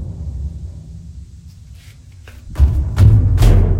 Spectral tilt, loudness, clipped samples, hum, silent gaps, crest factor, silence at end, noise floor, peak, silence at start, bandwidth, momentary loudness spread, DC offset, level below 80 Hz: -8 dB/octave; -15 LUFS; under 0.1%; none; none; 14 dB; 0 s; -39 dBFS; 0 dBFS; 0 s; 15 kHz; 23 LU; under 0.1%; -18 dBFS